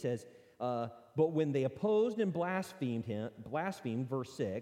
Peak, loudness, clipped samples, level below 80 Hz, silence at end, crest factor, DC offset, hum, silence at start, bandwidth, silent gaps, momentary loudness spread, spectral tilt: -18 dBFS; -36 LUFS; under 0.1%; -76 dBFS; 0 s; 16 dB; under 0.1%; none; 0 s; 15 kHz; none; 9 LU; -7.5 dB/octave